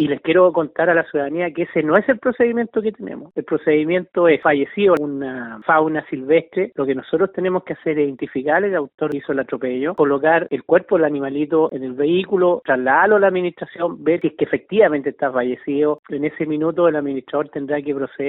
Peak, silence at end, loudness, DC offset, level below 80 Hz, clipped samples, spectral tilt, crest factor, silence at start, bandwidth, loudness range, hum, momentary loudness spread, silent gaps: 0 dBFS; 0 s; -19 LUFS; under 0.1%; -62 dBFS; under 0.1%; -4.5 dB/octave; 18 dB; 0 s; 4.1 kHz; 3 LU; none; 9 LU; 8.94-8.98 s, 15.99-16.03 s